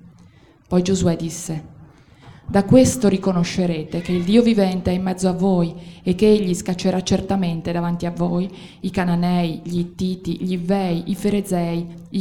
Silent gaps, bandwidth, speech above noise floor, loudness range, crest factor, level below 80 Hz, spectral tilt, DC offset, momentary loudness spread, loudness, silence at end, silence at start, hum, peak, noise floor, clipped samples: none; 14.5 kHz; 30 dB; 4 LU; 18 dB; -44 dBFS; -6.5 dB/octave; under 0.1%; 10 LU; -20 LUFS; 0 s; 0.7 s; none; -2 dBFS; -49 dBFS; under 0.1%